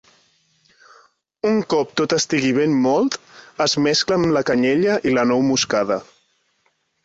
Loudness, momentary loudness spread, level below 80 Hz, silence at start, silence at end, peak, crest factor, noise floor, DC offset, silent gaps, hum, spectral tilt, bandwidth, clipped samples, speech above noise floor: -19 LUFS; 6 LU; -58 dBFS; 1.45 s; 1 s; -4 dBFS; 16 dB; -66 dBFS; under 0.1%; none; none; -4 dB/octave; 8 kHz; under 0.1%; 48 dB